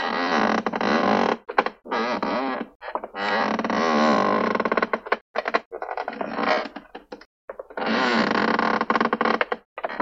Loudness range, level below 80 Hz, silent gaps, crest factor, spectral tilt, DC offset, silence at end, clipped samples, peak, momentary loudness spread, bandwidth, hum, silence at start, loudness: 3 LU; -62 dBFS; 2.75-2.80 s, 5.21-5.34 s, 5.66-5.71 s, 7.26-7.48 s, 9.65-9.76 s; 22 dB; -5 dB/octave; under 0.1%; 0 s; under 0.1%; -2 dBFS; 12 LU; 7.8 kHz; none; 0 s; -23 LUFS